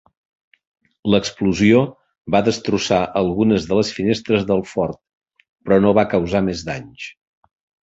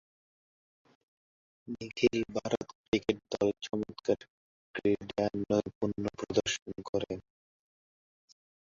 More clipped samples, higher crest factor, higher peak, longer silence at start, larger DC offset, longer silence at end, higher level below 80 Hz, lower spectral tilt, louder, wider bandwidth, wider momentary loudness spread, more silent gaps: neither; about the same, 18 dB vs 22 dB; first, -2 dBFS vs -12 dBFS; second, 1.05 s vs 1.65 s; neither; second, 0.7 s vs 1.45 s; first, -46 dBFS vs -62 dBFS; about the same, -6 dB/octave vs -5 dB/octave; first, -18 LUFS vs -33 LUFS; about the same, 8 kHz vs 7.6 kHz; first, 14 LU vs 9 LU; second, 5.17-5.21 s, 5.49-5.56 s vs 2.75-2.92 s, 4.30-4.74 s, 5.75-5.81 s, 6.62-6.66 s, 6.89-6.93 s